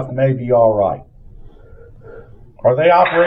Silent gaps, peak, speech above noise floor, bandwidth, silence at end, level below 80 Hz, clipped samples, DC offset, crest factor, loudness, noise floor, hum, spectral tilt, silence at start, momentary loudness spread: none; 0 dBFS; 26 dB; 5.2 kHz; 0 s; -42 dBFS; under 0.1%; under 0.1%; 16 dB; -14 LUFS; -40 dBFS; none; -9.5 dB/octave; 0 s; 8 LU